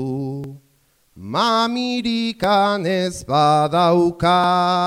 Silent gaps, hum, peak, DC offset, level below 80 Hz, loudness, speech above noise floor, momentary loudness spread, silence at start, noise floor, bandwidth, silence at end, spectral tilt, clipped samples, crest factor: none; none; -4 dBFS; under 0.1%; -50 dBFS; -18 LUFS; 43 dB; 11 LU; 0 s; -60 dBFS; 16 kHz; 0 s; -5.5 dB/octave; under 0.1%; 14 dB